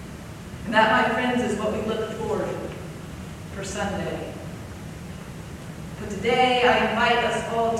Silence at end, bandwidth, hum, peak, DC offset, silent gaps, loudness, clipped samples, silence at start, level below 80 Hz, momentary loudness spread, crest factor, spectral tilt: 0 s; 15.5 kHz; none; -4 dBFS; under 0.1%; none; -23 LUFS; under 0.1%; 0 s; -46 dBFS; 19 LU; 20 dB; -4.5 dB/octave